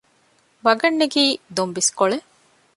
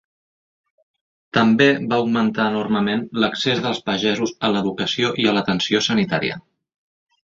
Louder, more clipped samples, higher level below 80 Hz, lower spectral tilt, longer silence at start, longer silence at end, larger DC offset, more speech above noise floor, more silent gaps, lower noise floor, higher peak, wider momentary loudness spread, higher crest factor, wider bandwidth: about the same, -19 LUFS vs -19 LUFS; neither; second, -68 dBFS vs -58 dBFS; second, -2 dB/octave vs -5 dB/octave; second, 0.65 s vs 1.35 s; second, 0.55 s vs 1 s; neither; second, 41 dB vs over 71 dB; neither; second, -60 dBFS vs under -90 dBFS; about the same, -2 dBFS vs -2 dBFS; about the same, 7 LU vs 6 LU; about the same, 18 dB vs 18 dB; first, 11.5 kHz vs 7.6 kHz